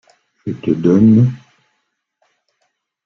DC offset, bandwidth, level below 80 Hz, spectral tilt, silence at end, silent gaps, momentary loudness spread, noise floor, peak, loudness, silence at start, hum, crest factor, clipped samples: under 0.1%; 6.4 kHz; -52 dBFS; -10.5 dB/octave; 1.7 s; none; 20 LU; -70 dBFS; -2 dBFS; -13 LUFS; 0.45 s; none; 14 dB; under 0.1%